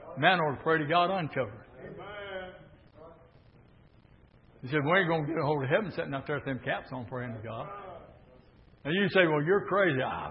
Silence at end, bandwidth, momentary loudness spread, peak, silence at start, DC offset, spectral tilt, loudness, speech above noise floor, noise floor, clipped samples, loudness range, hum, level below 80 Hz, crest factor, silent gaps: 0 s; 5.6 kHz; 19 LU; -8 dBFS; 0 s; under 0.1%; -10 dB/octave; -29 LUFS; 30 dB; -59 dBFS; under 0.1%; 10 LU; none; -62 dBFS; 24 dB; none